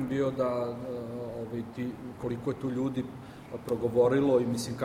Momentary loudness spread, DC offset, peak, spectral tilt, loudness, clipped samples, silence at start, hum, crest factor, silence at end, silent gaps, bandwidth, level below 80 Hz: 13 LU; under 0.1%; -12 dBFS; -7 dB/octave; -31 LUFS; under 0.1%; 0 s; none; 18 dB; 0 s; none; 16 kHz; -60 dBFS